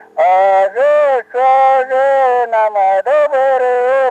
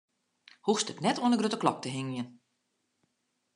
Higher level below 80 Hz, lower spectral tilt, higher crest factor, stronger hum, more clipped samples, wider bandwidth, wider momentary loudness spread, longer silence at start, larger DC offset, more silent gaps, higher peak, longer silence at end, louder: first, -66 dBFS vs -82 dBFS; second, -3 dB/octave vs -4.5 dB/octave; second, 8 dB vs 22 dB; neither; neither; second, 8.4 kHz vs 11 kHz; second, 3 LU vs 10 LU; second, 0.15 s vs 0.65 s; neither; neither; first, -4 dBFS vs -10 dBFS; second, 0 s vs 1.25 s; first, -12 LUFS vs -30 LUFS